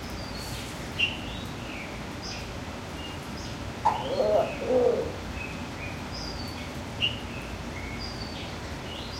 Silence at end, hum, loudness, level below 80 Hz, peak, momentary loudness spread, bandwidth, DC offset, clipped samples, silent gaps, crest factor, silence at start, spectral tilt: 0 s; none; -31 LUFS; -44 dBFS; -12 dBFS; 11 LU; 16 kHz; under 0.1%; under 0.1%; none; 20 dB; 0 s; -4.5 dB/octave